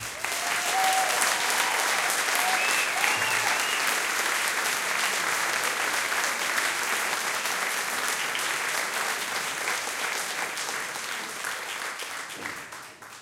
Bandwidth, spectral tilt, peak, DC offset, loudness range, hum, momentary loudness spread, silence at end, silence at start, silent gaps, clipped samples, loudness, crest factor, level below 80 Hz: 17 kHz; 1 dB/octave; -6 dBFS; under 0.1%; 6 LU; none; 9 LU; 0 s; 0 s; none; under 0.1%; -25 LUFS; 22 dB; -72 dBFS